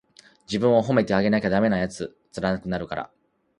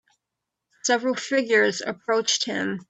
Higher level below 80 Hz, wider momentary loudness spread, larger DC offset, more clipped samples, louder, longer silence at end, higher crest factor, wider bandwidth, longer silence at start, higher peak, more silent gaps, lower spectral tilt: first, -52 dBFS vs -74 dBFS; first, 14 LU vs 6 LU; neither; neither; about the same, -23 LUFS vs -23 LUFS; first, 0.55 s vs 0.05 s; about the same, 20 dB vs 18 dB; first, 11 kHz vs 8.4 kHz; second, 0.5 s vs 0.85 s; about the same, -6 dBFS vs -6 dBFS; neither; first, -6.5 dB/octave vs -2 dB/octave